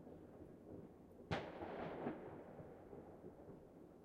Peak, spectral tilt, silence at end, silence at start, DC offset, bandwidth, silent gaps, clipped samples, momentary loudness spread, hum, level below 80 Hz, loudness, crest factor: -28 dBFS; -7 dB/octave; 0 s; 0 s; under 0.1%; 13.5 kHz; none; under 0.1%; 13 LU; none; -70 dBFS; -53 LUFS; 24 dB